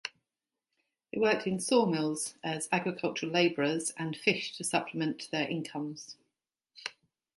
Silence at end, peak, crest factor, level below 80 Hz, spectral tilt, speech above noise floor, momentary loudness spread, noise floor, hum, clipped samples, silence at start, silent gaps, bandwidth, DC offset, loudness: 0.45 s; -10 dBFS; 22 dB; -78 dBFS; -4 dB/octave; 59 dB; 16 LU; -90 dBFS; none; under 0.1%; 0.05 s; none; 12 kHz; under 0.1%; -31 LUFS